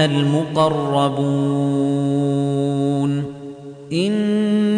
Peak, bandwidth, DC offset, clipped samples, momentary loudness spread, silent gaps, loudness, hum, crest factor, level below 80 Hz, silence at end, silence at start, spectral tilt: -4 dBFS; 10 kHz; under 0.1%; under 0.1%; 8 LU; none; -19 LUFS; none; 14 dB; -58 dBFS; 0 s; 0 s; -7 dB/octave